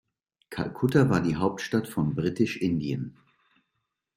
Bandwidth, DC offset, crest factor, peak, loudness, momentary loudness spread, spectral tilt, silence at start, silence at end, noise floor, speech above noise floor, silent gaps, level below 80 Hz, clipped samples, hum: 16 kHz; under 0.1%; 20 dB; -8 dBFS; -27 LUFS; 12 LU; -7 dB/octave; 0.5 s; 1.05 s; -81 dBFS; 55 dB; none; -58 dBFS; under 0.1%; none